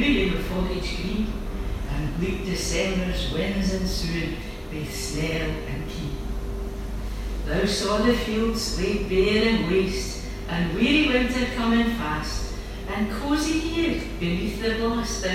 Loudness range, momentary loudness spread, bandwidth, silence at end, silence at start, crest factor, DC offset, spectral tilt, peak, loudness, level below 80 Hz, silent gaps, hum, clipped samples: 6 LU; 11 LU; 16 kHz; 0 s; 0 s; 16 dB; under 0.1%; -5 dB/octave; -8 dBFS; -25 LUFS; -32 dBFS; none; none; under 0.1%